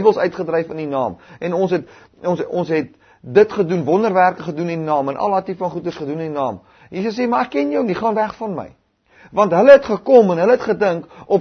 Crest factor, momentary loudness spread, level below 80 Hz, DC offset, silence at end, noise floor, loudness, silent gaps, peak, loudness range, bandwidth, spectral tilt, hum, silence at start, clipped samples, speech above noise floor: 18 dB; 13 LU; -58 dBFS; under 0.1%; 0 s; -50 dBFS; -17 LUFS; none; 0 dBFS; 7 LU; 6.6 kHz; -7.5 dB/octave; none; 0 s; under 0.1%; 33 dB